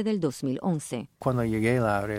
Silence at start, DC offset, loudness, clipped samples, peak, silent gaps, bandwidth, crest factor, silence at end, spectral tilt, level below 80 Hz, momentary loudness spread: 0 s; under 0.1%; -28 LUFS; under 0.1%; -10 dBFS; none; 16 kHz; 16 dB; 0 s; -6.5 dB/octave; -54 dBFS; 7 LU